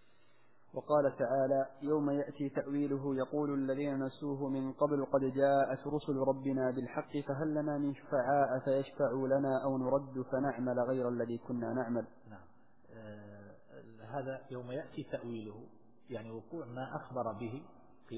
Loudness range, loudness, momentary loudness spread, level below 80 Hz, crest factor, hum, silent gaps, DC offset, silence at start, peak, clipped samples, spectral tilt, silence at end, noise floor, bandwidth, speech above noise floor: 11 LU; -35 LUFS; 15 LU; -72 dBFS; 18 dB; none; none; 0.1%; 0.75 s; -18 dBFS; under 0.1%; -7.5 dB/octave; 0 s; -70 dBFS; 4 kHz; 35 dB